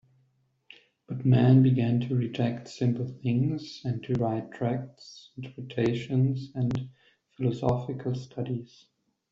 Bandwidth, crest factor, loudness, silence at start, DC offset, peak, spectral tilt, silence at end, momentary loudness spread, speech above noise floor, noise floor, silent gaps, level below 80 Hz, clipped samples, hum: 7.4 kHz; 18 dB; -28 LUFS; 1.1 s; under 0.1%; -10 dBFS; -8.5 dB/octave; 0.65 s; 16 LU; 43 dB; -70 dBFS; none; -60 dBFS; under 0.1%; none